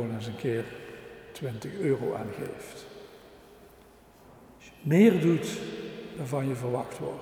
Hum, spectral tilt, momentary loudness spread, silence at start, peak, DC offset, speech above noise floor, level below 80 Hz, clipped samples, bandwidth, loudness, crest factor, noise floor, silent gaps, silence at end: none; -7 dB/octave; 24 LU; 0 s; -8 dBFS; under 0.1%; 27 dB; -64 dBFS; under 0.1%; 18 kHz; -29 LUFS; 22 dB; -55 dBFS; none; 0 s